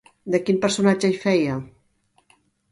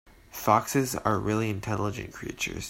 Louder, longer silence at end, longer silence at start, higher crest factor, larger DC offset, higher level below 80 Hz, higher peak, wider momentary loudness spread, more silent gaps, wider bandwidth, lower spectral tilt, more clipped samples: first, -21 LUFS vs -28 LUFS; first, 1.05 s vs 0 s; first, 0.25 s vs 0.05 s; second, 18 dB vs 24 dB; neither; second, -60 dBFS vs -52 dBFS; about the same, -6 dBFS vs -6 dBFS; second, 7 LU vs 12 LU; neither; second, 11.5 kHz vs 16.5 kHz; about the same, -5.5 dB/octave vs -5 dB/octave; neither